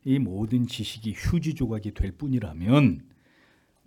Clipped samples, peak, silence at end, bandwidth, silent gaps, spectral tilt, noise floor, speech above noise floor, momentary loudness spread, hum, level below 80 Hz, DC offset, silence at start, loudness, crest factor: under 0.1%; -8 dBFS; 0.85 s; 15 kHz; none; -7 dB/octave; -62 dBFS; 37 dB; 11 LU; none; -40 dBFS; under 0.1%; 0.05 s; -26 LUFS; 18 dB